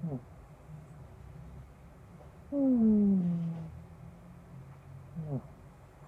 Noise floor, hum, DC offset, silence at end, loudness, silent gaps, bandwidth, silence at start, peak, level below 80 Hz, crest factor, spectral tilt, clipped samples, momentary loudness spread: -54 dBFS; none; under 0.1%; 0 s; -31 LUFS; none; 3.3 kHz; 0 s; -18 dBFS; -58 dBFS; 16 dB; -11 dB/octave; under 0.1%; 27 LU